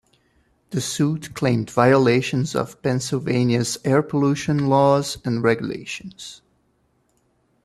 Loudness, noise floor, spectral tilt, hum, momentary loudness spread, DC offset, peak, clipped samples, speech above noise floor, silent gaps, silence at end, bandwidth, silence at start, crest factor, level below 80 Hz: -20 LUFS; -65 dBFS; -5.5 dB/octave; none; 13 LU; under 0.1%; -2 dBFS; under 0.1%; 45 dB; none; 1.3 s; 13.5 kHz; 0.7 s; 20 dB; -56 dBFS